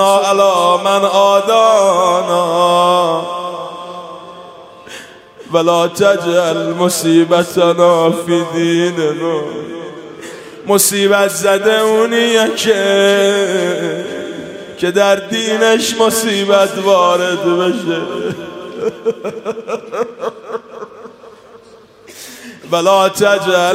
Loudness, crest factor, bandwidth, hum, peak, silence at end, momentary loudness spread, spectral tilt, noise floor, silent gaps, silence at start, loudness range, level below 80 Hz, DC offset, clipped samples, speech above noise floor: -13 LUFS; 14 dB; 16 kHz; none; 0 dBFS; 0 s; 18 LU; -3.5 dB/octave; -41 dBFS; none; 0 s; 10 LU; -60 dBFS; under 0.1%; under 0.1%; 29 dB